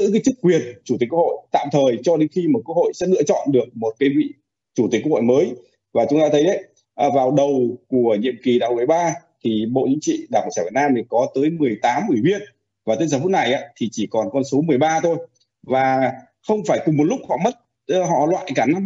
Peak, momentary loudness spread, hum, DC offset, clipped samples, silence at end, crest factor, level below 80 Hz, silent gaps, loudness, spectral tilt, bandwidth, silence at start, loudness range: -4 dBFS; 7 LU; none; under 0.1%; under 0.1%; 0 s; 16 dB; -66 dBFS; none; -19 LUFS; -5.5 dB/octave; 8 kHz; 0 s; 2 LU